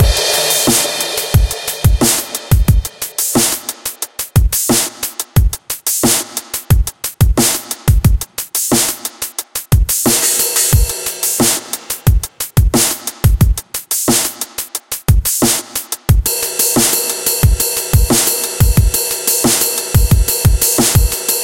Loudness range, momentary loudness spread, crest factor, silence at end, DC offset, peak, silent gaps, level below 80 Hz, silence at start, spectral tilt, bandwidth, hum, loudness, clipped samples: 3 LU; 9 LU; 14 dB; 0 s; under 0.1%; 0 dBFS; none; -20 dBFS; 0 s; -3.5 dB/octave; 17.5 kHz; none; -13 LUFS; under 0.1%